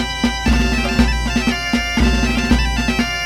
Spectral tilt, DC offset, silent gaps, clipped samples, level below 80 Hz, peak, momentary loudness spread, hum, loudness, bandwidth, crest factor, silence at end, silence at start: -4.5 dB/octave; under 0.1%; none; under 0.1%; -20 dBFS; 0 dBFS; 2 LU; none; -17 LUFS; 15 kHz; 16 dB; 0 s; 0 s